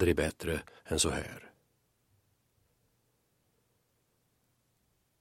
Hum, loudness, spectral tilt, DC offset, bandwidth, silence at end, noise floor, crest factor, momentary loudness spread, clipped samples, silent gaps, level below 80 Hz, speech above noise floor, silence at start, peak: none; -33 LUFS; -4 dB/octave; under 0.1%; 16.5 kHz; 3.7 s; -76 dBFS; 24 dB; 14 LU; under 0.1%; none; -52 dBFS; 43 dB; 0 s; -14 dBFS